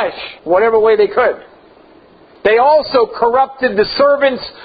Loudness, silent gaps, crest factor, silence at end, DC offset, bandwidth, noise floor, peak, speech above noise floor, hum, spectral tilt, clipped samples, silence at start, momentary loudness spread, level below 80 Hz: -13 LUFS; none; 14 dB; 0 s; under 0.1%; 5 kHz; -44 dBFS; 0 dBFS; 31 dB; none; -7.5 dB/octave; under 0.1%; 0 s; 7 LU; -48 dBFS